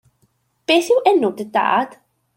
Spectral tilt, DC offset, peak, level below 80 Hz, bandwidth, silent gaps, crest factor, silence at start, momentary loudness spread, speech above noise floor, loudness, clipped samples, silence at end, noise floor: -3.5 dB/octave; under 0.1%; -2 dBFS; -70 dBFS; 16.5 kHz; none; 16 dB; 0.7 s; 11 LU; 47 dB; -17 LUFS; under 0.1%; 0.5 s; -64 dBFS